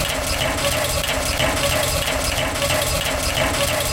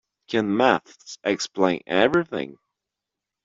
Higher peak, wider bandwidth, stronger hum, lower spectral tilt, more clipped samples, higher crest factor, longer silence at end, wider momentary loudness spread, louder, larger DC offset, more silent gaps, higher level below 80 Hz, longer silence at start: about the same, -6 dBFS vs -4 dBFS; first, 17 kHz vs 7.8 kHz; neither; second, -2.5 dB/octave vs -4.5 dB/octave; neither; about the same, 16 dB vs 20 dB; second, 0 s vs 0.9 s; second, 2 LU vs 11 LU; first, -19 LUFS vs -23 LUFS; neither; neither; first, -30 dBFS vs -62 dBFS; second, 0 s vs 0.3 s